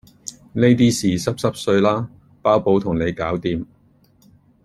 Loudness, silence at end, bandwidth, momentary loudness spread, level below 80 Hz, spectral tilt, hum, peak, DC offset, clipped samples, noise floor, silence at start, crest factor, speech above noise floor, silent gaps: -19 LUFS; 1 s; 13.5 kHz; 16 LU; -48 dBFS; -6 dB/octave; none; -2 dBFS; under 0.1%; under 0.1%; -55 dBFS; 0.25 s; 18 dB; 37 dB; none